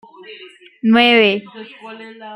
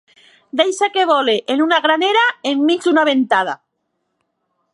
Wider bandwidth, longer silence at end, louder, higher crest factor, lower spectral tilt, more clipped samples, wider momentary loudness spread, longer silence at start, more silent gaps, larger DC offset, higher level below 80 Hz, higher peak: second, 10 kHz vs 11.5 kHz; second, 0 s vs 1.2 s; about the same, -13 LUFS vs -15 LUFS; about the same, 16 dB vs 16 dB; first, -6 dB/octave vs -2.5 dB/octave; neither; first, 25 LU vs 4 LU; second, 0.3 s vs 0.55 s; neither; neither; first, -64 dBFS vs -76 dBFS; about the same, -2 dBFS vs 0 dBFS